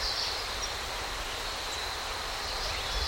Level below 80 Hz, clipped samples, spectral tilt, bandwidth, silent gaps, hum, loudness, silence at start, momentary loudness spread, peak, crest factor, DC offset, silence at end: -42 dBFS; under 0.1%; -1.5 dB/octave; 17 kHz; none; none; -33 LUFS; 0 s; 3 LU; -18 dBFS; 16 dB; under 0.1%; 0 s